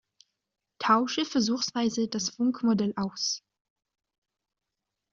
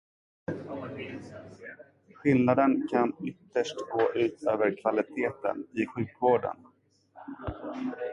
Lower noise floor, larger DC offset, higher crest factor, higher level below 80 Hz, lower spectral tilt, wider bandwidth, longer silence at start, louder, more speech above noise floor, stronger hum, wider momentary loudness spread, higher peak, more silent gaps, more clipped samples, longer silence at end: first, -86 dBFS vs -58 dBFS; neither; about the same, 20 dB vs 20 dB; second, -70 dBFS vs -58 dBFS; second, -3.5 dB/octave vs -7 dB/octave; second, 7.6 kHz vs 9.8 kHz; first, 0.8 s vs 0.5 s; about the same, -27 LUFS vs -29 LUFS; first, 59 dB vs 29 dB; neither; second, 6 LU vs 20 LU; about the same, -10 dBFS vs -10 dBFS; neither; neither; first, 1.75 s vs 0 s